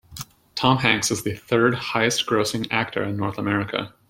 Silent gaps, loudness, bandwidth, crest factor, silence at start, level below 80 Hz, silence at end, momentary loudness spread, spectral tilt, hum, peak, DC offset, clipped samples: none; -22 LUFS; 16.5 kHz; 22 dB; 0.1 s; -56 dBFS; 0.2 s; 9 LU; -4 dB/octave; none; 0 dBFS; under 0.1%; under 0.1%